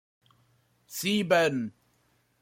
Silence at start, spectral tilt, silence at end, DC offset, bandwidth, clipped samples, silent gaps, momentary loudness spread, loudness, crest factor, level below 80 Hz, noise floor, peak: 0.9 s; -4 dB/octave; 0.7 s; under 0.1%; 16.5 kHz; under 0.1%; none; 16 LU; -27 LUFS; 20 dB; -72 dBFS; -69 dBFS; -10 dBFS